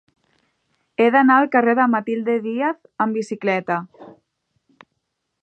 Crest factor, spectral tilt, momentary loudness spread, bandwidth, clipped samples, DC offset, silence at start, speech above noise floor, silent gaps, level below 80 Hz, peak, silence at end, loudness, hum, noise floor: 18 dB; -6.5 dB/octave; 11 LU; 8.8 kHz; under 0.1%; under 0.1%; 1 s; 57 dB; none; -76 dBFS; -2 dBFS; 1.35 s; -19 LUFS; none; -75 dBFS